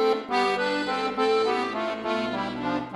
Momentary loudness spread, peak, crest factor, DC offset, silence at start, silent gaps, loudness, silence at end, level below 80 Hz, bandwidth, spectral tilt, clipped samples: 6 LU; -10 dBFS; 14 dB; under 0.1%; 0 s; none; -26 LUFS; 0 s; -60 dBFS; 11.5 kHz; -4.5 dB/octave; under 0.1%